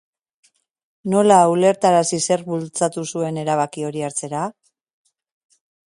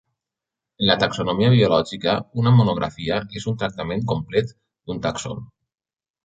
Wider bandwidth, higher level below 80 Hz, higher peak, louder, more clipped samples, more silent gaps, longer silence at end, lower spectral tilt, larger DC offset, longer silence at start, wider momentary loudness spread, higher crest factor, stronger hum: first, 11.5 kHz vs 8 kHz; second, -66 dBFS vs -50 dBFS; about the same, 0 dBFS vs -2 dBFS; about the same, -19 LUFS vs -21 LUFS; neither; neither; first, 1.4 s vs 0.8 s; second, -5 dB/octave vs -6.5 dB/octave; neither; first, 1.05 s vs 0.8 s; about the same, 13 LU vs 14 LU; about the same, 20 dB vs 20 dB; neither